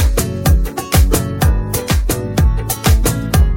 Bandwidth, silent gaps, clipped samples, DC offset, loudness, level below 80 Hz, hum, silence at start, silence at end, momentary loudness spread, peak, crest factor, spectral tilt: 17 kHz; none; under 0.1%; under 0.1%; -15 LUFS; -16 dBFS; none; 0 s; 0 s; 3 LU; 0 dBFS; 12 dB; -5 dB/octave